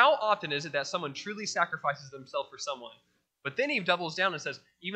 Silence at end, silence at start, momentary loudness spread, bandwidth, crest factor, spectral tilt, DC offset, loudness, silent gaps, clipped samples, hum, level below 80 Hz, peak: 0 s; 0 s; 12 LU; 9 kHz; 24 dB; -3 dB/octave; under 0.1%; -31 LUFS; none; under 0.1%; none; -82 dBFS; -6 dBFS